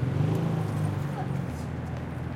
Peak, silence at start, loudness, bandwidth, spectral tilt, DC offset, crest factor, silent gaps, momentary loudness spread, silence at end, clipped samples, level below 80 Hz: -16 dBFS; 0 s; -30 LUFS; 15.5 kHz; -8 dB/octave; under 0.1%; 14 dB; none; 7 LU; 0 s; under 0.1%; -50 dBFS